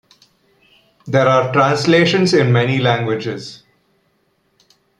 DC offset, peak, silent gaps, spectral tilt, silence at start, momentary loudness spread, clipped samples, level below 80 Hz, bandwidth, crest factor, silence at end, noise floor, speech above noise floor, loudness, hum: under 0.1%; -2 dBFS; none; -6 dB/octave; 1.05 s; 11 LU; under 0.1%; -58 dBFS; 11 kHz; 16 dB; 1.45 s; -63 dBFS; 48 dB; -15 LUFS; none